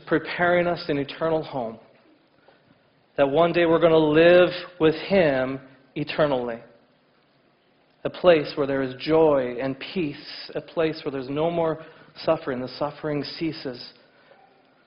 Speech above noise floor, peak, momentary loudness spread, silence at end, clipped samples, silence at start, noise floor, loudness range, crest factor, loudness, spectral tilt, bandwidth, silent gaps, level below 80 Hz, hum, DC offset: 40 dB; -6 dBFS; 16 LU; 0.95 s; under 0.1%; 0.05 s; -62 dBFS; 8 LU; 18 dB; -23 LUFS; -9 dB/octave; 5.6 kHz; none; -56 dBFS; none; under 0.1%